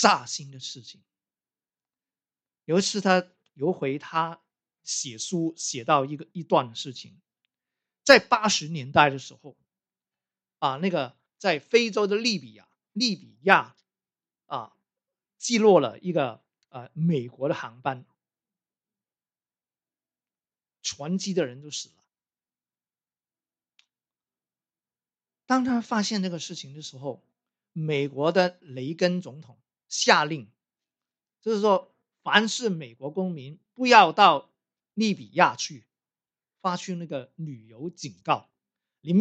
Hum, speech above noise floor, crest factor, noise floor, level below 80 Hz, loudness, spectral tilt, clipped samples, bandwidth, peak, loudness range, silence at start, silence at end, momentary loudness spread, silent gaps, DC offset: none; over 65 dB; 28 dB; under -90 dBFS; -72 dBFS; -25 LUFS; -4 dB/octave; under 0.1%; 12 kHz; 0 dBFS; 12 LU; 0 s; 0 s; 19 LU; none; under 0.1%